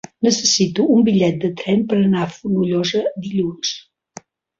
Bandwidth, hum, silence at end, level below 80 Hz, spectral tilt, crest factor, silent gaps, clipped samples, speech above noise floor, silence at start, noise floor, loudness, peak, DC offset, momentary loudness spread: 7.6 kHz; none; 0.8 s; -56 dBFS; -4.5 dB/octave; 14 dB; none; under 0.1%; 25 dB; 0.2 s; -42 dBFS; -18 LUFS; -4 dBFS; under 0.1%; 8 LU